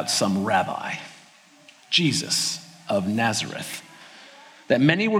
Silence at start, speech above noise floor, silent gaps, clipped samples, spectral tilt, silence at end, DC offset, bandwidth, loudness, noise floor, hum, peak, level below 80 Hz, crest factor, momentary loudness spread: 0 s; 30 dB; none; under 0.1%; -3.5 dB/octave; 0 s; under 0.1%; 17 kHz; -23 LUFS; -52 dBFS; none; -2 dBFS; -68 dBFS; 22 dB; 17 LU